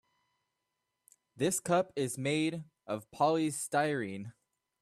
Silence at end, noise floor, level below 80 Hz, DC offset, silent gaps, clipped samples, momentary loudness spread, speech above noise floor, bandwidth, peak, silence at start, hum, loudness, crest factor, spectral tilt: 0.5 s; -85 dBFS; -76 dBFS; under 0.1%; none; under 0.1%; 12 LU; 53 dB; 14.5 kHz; -16 dBFS; 1.35 s; none; -33 LUFS; 18 dB; -4.5 dB/octave